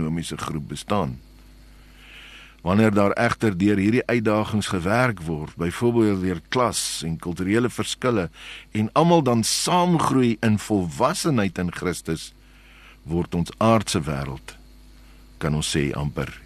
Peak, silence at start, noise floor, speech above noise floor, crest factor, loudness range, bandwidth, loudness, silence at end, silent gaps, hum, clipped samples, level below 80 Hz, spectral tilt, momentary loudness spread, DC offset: -4 dBFS; 0 s; -48 dBFS; 26 dB; 20 dB; 5 LU; 13 kHz; -22 LUFS; 0.05 s; none; none; under 0.1%; -46 dBFS; -5 dB/octave; 12 LU; under 0.1%